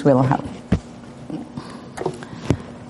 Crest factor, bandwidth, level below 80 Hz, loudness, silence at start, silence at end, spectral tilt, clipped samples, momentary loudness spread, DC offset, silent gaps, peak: 20 dB; 11.5 kHz; -42 dBFS; -24 LUFS; 0 s; 0 s; -8 dB/octave; under 0.1%; 17 LU; under 0.1%; none; -2 dBFS